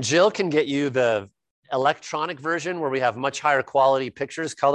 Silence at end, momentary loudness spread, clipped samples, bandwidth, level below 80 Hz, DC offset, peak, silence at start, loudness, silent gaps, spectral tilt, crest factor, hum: 0 s; 9 LU; under 0.1%; 10.5 kHz; -66 dBFS; under 0.1%; -6 dBFS; 0 s; -23 LUFS; 1.51-1.63 s; -4 dB/octave; 18 dB; none